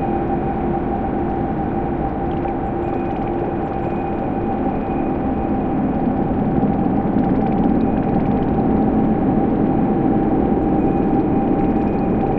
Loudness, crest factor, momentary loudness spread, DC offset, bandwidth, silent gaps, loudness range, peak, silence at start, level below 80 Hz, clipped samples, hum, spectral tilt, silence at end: -19 LUFS; 14 dB; 5 LU; under 0.1%; 4.4 kHz; none; 4 LU; -4 dBFS; 0 s; -30 dBFS; under 0.1%; none; -11.5 dB/octave; 0 s